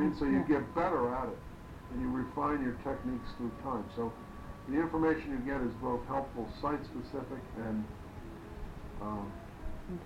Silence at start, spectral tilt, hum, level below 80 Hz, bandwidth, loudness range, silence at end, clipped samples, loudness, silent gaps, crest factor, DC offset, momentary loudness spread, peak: 0 s; -8 dB/octave; none; -50 dBFS; 15.5 kHz; 6 LU; 0 s; under 0.1%; -36 LUFS; none; 18 dB; under 0.1%; 16 LU; -18 dBFS